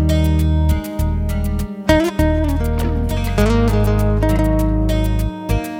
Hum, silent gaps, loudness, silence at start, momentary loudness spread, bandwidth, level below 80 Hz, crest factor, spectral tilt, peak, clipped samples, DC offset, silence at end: none; none; -18 LUFS; 0 s; 6 LU; 17 kHz; -20 dBFS; 14 dB; -7 dB/octave; 0 dBFS; under 0.1%; under 0.1%; 0 s